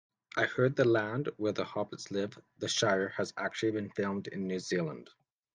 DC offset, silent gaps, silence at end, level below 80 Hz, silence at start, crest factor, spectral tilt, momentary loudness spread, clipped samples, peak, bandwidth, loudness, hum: under 0.1%; none; 0.5 s; -74 dBFS; 0.35 s; 20 dB; -4.5 dB/octave; 10 LU; under 0.1%; -14 dBFS; 10 kHz; -33 LUFS; none